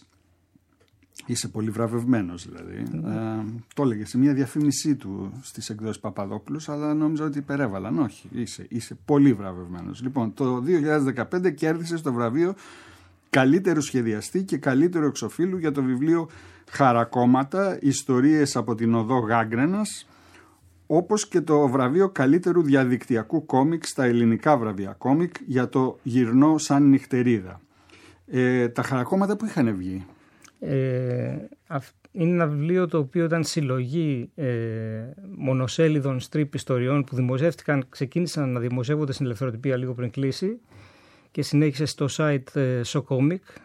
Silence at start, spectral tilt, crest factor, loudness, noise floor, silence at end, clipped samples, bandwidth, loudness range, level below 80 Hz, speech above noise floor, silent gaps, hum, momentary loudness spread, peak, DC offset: 1.2 s; -6.5 dB/octave; 20 dB; -24 LUFS; -63 dBFS; 0.25 s; under 0.1%; 14 kHz; 6 LU; -66 dBFS; 40 dB; none; none; 13 LU; -4 dBFS; under 0.1%